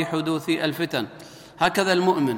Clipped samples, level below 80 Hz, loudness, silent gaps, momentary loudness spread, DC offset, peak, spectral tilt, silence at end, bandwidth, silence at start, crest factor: under 0.1%; -62 dBFS; -23 LUFS; none; 16 LU; under 0.1%; -6 dBFS; -5 dB/octave; 0 s; 17 kHz; 0 s; 18 dB